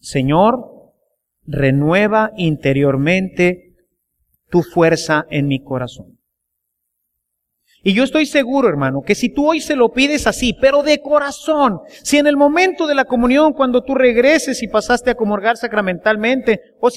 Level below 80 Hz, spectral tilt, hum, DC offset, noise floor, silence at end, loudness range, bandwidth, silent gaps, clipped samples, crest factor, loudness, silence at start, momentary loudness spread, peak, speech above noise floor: -42 dBFS; -5.5 dB/octave; none; under 0.1%; -75 dBFS; 0 s; 6 LU; 15 kHz; none; under 0.1%; 16 dB; -15 LUFS; 0.05 s; 6 LU; 0 dBFS; 60 dB